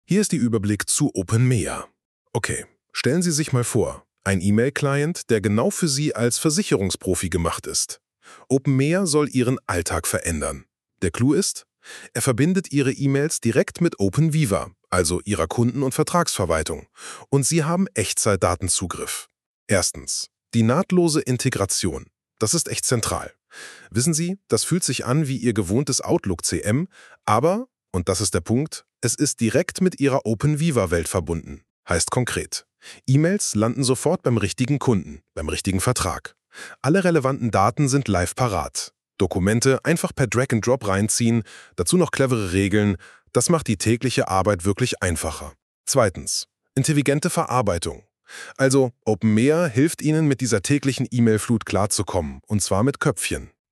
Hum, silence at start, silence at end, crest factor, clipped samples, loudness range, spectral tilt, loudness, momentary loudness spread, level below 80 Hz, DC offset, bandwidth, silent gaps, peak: none; 0.1 s; 0.25 s; 18 dB; under 0.1%; 2 LU; -5 dB/octave; -22 LUFS; 10 LU; -46 dBFS; under 0.1%; 13.5 kHz; 2.05-2.25 s, 19.46-19.67 s, 31.70-31.83 s, 45.62-45.84 s; -4 dBFS